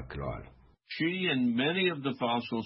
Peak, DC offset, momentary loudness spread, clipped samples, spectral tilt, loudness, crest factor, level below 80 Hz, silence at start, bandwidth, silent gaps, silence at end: -16 dBFS; under 0.1%; 12 LU; under 0.1%; -9.5 dB/octave; -30 LUFS; 16 dB; -54 dBFS; 0 s; 5.8 kHz; none; 0 s